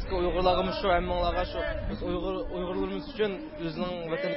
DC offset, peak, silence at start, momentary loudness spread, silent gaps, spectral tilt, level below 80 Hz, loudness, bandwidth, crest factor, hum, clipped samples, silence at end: under 0.1%; -10 dBFS; 0 s; 8 LU; none; -10 dB/octave; -40 dBFS; -30 LUFS; 5.8 kHz; 18 dB; none; under 0.1%; 0 s